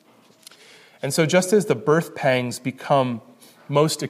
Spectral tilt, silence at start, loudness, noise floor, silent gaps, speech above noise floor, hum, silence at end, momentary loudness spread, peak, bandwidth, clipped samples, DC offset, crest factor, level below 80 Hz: -5 dB/octave; 1.05 s; -21 LUFS; -51 dBFS; none; 30 dB; none; 0 s; 10 LU; -6 dBFS; 15.5 kHz; under 0.1%; under 0.1%; 18 dB; -70 dBFS